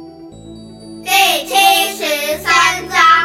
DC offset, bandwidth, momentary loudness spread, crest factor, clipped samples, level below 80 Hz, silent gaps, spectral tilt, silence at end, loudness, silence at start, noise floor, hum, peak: under 0.1%; 17 kHz; 7 LU; 14 dB; under 0.1%; -48 dBFS; none; -0.5 dB/octave; 0 s; -12 LUFS; 0 s; -34 dBFS; none; 0 dBFS